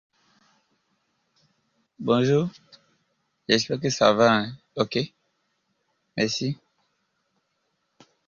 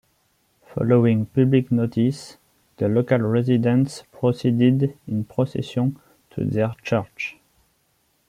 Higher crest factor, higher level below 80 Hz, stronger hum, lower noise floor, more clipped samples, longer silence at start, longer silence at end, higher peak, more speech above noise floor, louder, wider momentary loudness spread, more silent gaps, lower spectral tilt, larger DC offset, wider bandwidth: first, 24 dB vs 18 dB; second, -64 dBFS vs -58 dBFS; neither; first, -74 dBFS vs -66 dBFS; neither; first, 2 s vs 0.75 s; first, 1.75 s vs 1 s; about the same, -4 dBFS vs -4 dBFS; first, 52 dB vs 46 dB; about the same, -24 LUFS vs -22 LUFS; first, 15 LU vs 11 LU; neither; second, -5 dB/octave vs -8 dB/octave; neither; second, 7.6 kHz vs 11 kHz